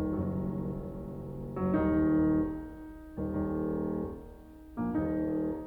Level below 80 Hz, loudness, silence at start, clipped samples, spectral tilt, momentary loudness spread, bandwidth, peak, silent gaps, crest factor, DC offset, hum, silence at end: -48 dBFS; -32 LUFS; 0 s; under 0.1%; -11 dB/octave; 18 LU; 3.4 kHz; -16 dBFS; none; 16 dB; under 0.1%; none; 0 s